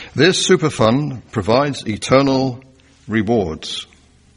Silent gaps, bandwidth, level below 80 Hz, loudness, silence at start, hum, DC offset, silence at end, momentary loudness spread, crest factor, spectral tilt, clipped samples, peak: none; 10.5 kHz; -46 dBFS; -17 LUFS; 0 s; none; under 0.1%; 0.5 s; 11 LU; 18 dB; -5 dB/octave; under 0.1%; 0 dBFS